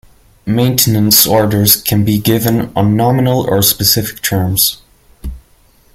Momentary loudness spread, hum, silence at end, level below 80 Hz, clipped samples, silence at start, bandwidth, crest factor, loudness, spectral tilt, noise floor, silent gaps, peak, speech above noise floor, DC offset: 20 LU; none; 0.55 s; -36 dBFS; 0.1%; 0.45 s; over 20 kHz; 12 dB; -11 LUFS; -4 dB/octave; -49 dBFS; none; 0 dBFS; 37 dB; under 0.1%